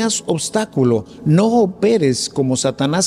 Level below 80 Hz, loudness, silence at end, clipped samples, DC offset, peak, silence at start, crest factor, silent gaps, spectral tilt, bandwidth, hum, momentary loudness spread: -52 dBFS; -17 LUFS; 0 s; under 0.1%; under 0.1%; -4 dBFS; 0 s; 12 dB; none; -5 dB/octave; 15 kHz; none; 5 LU